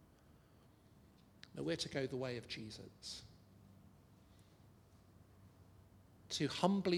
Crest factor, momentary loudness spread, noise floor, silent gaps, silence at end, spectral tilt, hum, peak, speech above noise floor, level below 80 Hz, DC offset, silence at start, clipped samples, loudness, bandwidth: 26 dB; 28 LU; -67 dBFS; none; 0 s; -5 dB/octave; none; -18 dBFS; 27 dB; -72 dBFS; under 0.1%; 0.3 s; under 0.1%; -42 LUFS; 15.5 kHz